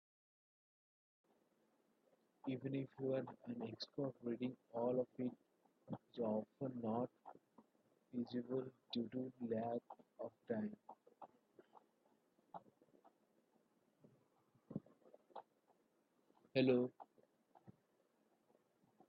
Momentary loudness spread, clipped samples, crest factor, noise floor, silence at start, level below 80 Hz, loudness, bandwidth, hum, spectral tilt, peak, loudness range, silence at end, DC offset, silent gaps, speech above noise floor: 20 LU; under 0.1%; 24 dB; -80 dBFS; 2.45 s; under -90 dBFS; -45 LUFS; 5 kHz; none; -6 dB/octave; -24 dBFS; 17 LU; 1.4 s; under 0.1%; none; 36 dB